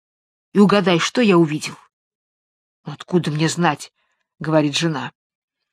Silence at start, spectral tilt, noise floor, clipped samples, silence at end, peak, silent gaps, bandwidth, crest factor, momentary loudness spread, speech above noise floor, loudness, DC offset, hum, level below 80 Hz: 0.55 s; -5.5 dB/octave; under -90 dBFS; under 0.1%; 0.65 s; 0 dBFS; 1.93-2.84 s; 13.5 kHz; 20 dB; 19 LU; over 72 dB; -18 LUFS; under 0.1%; none; -66 dBFS